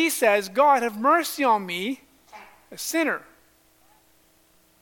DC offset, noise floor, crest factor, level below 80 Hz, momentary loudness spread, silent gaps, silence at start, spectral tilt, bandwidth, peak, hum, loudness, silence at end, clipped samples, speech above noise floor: under 0.1%; -60 dBFS; 18 dB; -72 dBFS; 13 LU; none; 0 s; -2.5 dB/octave; 17.5 kHz; -6 dBFS; none; -22 LUFS; 1.65 s; under 0.1%; 38 dB